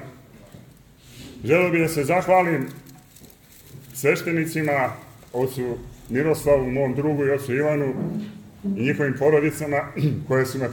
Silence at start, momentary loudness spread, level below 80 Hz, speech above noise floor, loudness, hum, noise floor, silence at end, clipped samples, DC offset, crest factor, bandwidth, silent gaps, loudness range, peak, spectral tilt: 0 s; 15 LU; -52 dBFS; 27 dB; -22 LUFS; none; -49 dBFS; 0 s; under 0.1%; under 0.1%; 18 dB; 17.5 kHz; none; 3 LU; -6 dBFS; -6.5 dB/octave